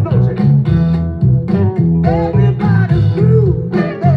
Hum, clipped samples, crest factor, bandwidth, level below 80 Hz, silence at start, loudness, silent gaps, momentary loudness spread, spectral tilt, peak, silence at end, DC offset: none; under 0.1%; 12 dB; 5 kHz; -30 dBFS; 0 s; -13 LUFS; none; 4 LU; -11 dB/octave; 0 dBFS; 0 s; under 0.1%